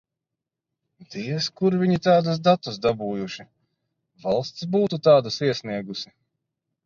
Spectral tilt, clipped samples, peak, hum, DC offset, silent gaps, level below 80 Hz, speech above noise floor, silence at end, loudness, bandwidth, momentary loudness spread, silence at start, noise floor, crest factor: -6.5 dB/octave; under 0.1%; -4 dBFS; none; under 0.1%; none; -62 dBFS; 64 dB; 0.8 s; -22 LUFS; 7.4 kHz; 16 LU; 1 s; -86 dBFS; 20 dB